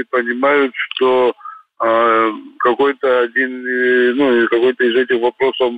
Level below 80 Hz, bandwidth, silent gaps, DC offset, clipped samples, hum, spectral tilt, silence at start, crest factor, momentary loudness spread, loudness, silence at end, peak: -62 dBFS; 4.8 kHz; none; under 0.1%; under 0.1%; none; -6 dB/octave; 0 s; 12 dB; 5 LU; -15 LUFS; 0 s; -2 dBFS